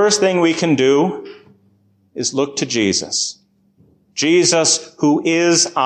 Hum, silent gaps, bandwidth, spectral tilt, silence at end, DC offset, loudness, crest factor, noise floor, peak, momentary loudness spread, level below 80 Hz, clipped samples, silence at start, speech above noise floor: none; none; 10.5 kHz; -3 dB/octave; 0 s; under 0.1%; -16 LUFS; 14 dB; -57 dBFS; -2 dBFS; 10 LU; -58 dBFS; under 0.1%; 0 s; 41 dB